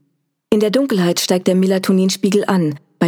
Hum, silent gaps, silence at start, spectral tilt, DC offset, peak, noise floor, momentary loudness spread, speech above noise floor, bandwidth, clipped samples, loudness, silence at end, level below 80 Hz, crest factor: none; none; 0.5 s; -5.5 dB/octave; under 0.1%; 0 dBFS; -66 dBFS; 3 LU; 51 dB; 18.5 kHz; under 0.1%; -16 LUFS; 0 s; -60 dBFS; 16 dB